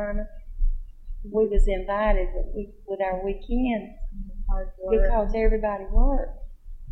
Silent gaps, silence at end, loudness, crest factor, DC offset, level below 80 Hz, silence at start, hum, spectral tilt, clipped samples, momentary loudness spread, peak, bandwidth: none; 0 s; -27 LUFS; 16 dB; under 0.1%; -26 dBFS; 0 s; none; -8.5 dB/octave; under 0.1%; 17 LU; -8 dBFS; 4.1 kHz